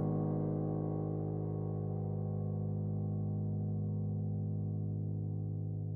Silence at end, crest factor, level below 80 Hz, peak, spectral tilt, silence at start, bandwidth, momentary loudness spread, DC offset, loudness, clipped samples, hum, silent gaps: 0 s; 12 dB; -60 dBFS; -24 dBFS; -15 dB/octave; 0 s; 1.7 kHz; 3 LU; under 0.1%; -37 LUFS; under 0.1%; 50 Hz at -110 dBFS; none